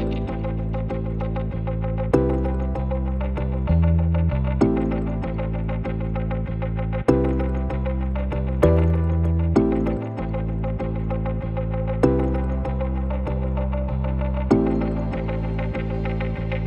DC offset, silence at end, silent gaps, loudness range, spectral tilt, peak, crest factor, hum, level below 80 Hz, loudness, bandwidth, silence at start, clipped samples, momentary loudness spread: under 0.1%; 0 s; none; 3 LU; -9.5 dB/octave; -4 dBFS; 18 dB; none; -26 dBFS; -24 LUFS; 8.4 kHz; 0 s; under 0.1%; 7 LU